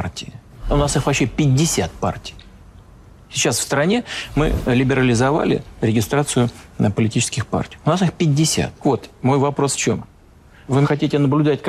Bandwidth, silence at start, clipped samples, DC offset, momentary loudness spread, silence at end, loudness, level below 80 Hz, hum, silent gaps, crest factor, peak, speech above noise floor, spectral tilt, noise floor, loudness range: 14.5 kHz; 0 s; under 0.1%; under 0.1%; 8 LU; 0 s; -19 LUFS; -36 dBFS; none; none; 12 dB; -6 dBFS; 28 dB; -5 dB/octave; -47 dBFS; 2 LU